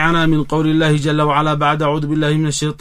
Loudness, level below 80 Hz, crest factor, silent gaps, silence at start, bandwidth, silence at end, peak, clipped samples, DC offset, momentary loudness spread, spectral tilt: -16 LUFS; -34 dBFS; 14 dB; none; 0 s; 11 kHz; 0.05 s; -2 dBFS; under 0.1%; under 0.1%; 3 LU; -5.5 dB/octave